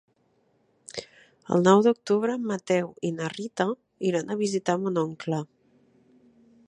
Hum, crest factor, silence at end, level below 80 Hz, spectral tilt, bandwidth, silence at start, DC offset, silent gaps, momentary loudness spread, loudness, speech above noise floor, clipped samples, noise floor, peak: none; 24 dB; 1.25 s; -72 dBFS; -6 dB/octave; 11 kHz; 0.95 s; under 0.1%; none; 15 LU; -26 LUFS; 43 dB; under 0.1%; -68 dBFS; -4 dBFS